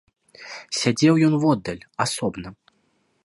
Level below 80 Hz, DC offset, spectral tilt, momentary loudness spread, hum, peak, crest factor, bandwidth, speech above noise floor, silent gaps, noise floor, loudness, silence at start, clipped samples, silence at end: -56 dBFS; under 0.1%; -5 dB/octave; 21 LU; none; -4 dBFS; 18 dB; 11.5 kHz; 46 dB; none; -67 dBFS; -21 LUFS; 0.4 s; under 0.1%; 0.7 s